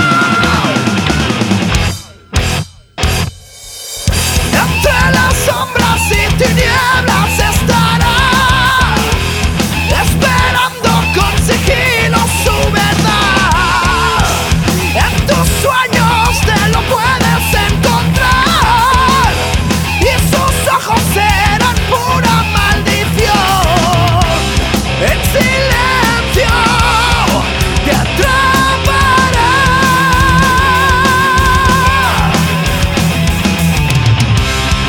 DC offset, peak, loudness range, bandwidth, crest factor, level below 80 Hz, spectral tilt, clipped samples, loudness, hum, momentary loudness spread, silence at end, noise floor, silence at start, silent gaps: under 0.1%; 0 dBFS; 3 LU; over 20 kHz; 10 dB; -20 dBFS; -4 dB/octave; under 0.1%; -10 LUFS; none; 4 LU; 0 s; -31 dBFS; 0 s; none